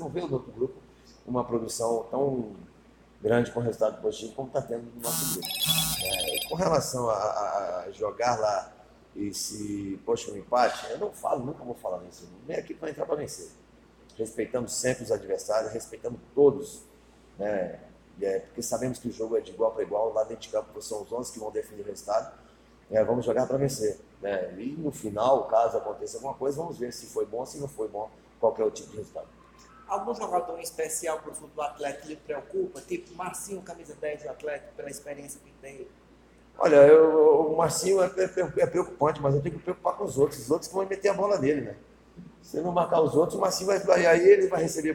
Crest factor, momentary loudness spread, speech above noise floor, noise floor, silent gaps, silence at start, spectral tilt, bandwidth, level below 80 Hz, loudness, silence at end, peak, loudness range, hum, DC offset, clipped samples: 22 dB; 15 LU; 29 dB; -56 dBFS; none; 0 s; -4.5 dB/octave; 17 kHz; -58 dBFS; -27 LUFS; 0 s; -6 dBFS; 12 LU; none; under 0.1%; under 0.1%